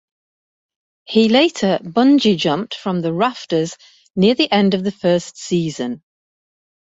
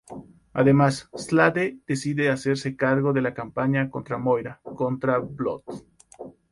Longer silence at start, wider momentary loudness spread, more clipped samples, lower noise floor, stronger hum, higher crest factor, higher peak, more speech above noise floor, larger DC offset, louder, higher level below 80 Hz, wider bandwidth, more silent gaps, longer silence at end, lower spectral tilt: first, 1.1 s vs 0.1 s; second, 10 LU vs 20 LU; neither; first, under -90 dBFS vs -44 dBFS; neither; about the same, 16 dB vs 20 dB; about the same, -2 dBFS vs -4 dBFS; first, over 74 dB vs 20 dB; neither; first, -17 LUFS vs -24 LUFS; about the same, -58 dBFS vs -58 dBFS; second, 8 kHz vs 11.5 kHz; neither; first, 0.9 s vs 0.2 s; about the same, -5.5 dB/octave vs -6.5 dB/octave